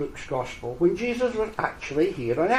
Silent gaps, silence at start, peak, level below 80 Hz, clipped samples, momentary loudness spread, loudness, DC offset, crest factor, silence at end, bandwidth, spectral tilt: none; 0 s; -8 dBFS; -48 dBFS; under 0.1%; 7 LU; -26 LUFS; under 0.1%; 18 dB; 0 s; 11.5 kHz; -6 dB/octave